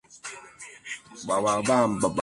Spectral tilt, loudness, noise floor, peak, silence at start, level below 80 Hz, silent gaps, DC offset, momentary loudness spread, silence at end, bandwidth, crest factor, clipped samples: -4.5 dB/octave; -24 LUFS; -46 dBFS; -10 dBFS; 0.1 s; -60 dBFS; none; under 0.1%; 19 LU; 0 s; 11.5 kHz; 18 dB; under 0.1%